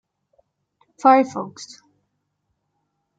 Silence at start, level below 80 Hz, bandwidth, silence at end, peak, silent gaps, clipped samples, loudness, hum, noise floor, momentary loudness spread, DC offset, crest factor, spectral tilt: 1.05 s; -80 dBFS; 9 kHz; 1.55 s; -2 dBFS; none; under 0.1%; -18 LUFS; none; -74 dBFS; 24 LU; under 0.1%; 22 dB; -5 dB/octave